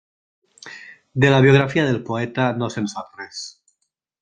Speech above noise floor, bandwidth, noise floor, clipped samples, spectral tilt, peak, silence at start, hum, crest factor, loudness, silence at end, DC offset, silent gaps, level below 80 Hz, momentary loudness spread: 56 dB; 9.2 kHz; -74 dBFS; under 0.1%; -6.5 dB/octave; -2 dBFS; 0.65 s; none; 20 dB; -18 LUFS; 0.7 s; under 0.1%; none; -54 dBFS; 23 LU